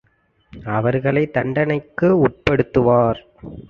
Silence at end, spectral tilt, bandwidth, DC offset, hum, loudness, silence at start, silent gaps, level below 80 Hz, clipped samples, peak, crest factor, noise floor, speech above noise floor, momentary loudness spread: 0.1 s; -9 dB/octave; 6.8 kHz; under 0.1%; none; -18 LUFS; 0.55 s; none; -44 dBFS; under 0.1%; 0 dBFS; 18 dB; -61 dBFS; 43 dB; 10 LU